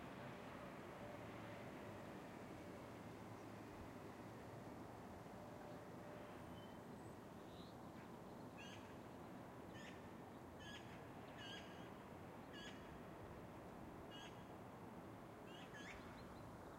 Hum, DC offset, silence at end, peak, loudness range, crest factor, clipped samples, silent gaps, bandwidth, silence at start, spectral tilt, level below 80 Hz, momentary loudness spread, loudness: none; under 0.1%; 0 s; -42 dBFS; 1 LU; 14 dB; under 0.1%; none; 16 kHz; 0 s; -5.5 dB/octave; -74 dBFS; 3 LU; -56 LUFS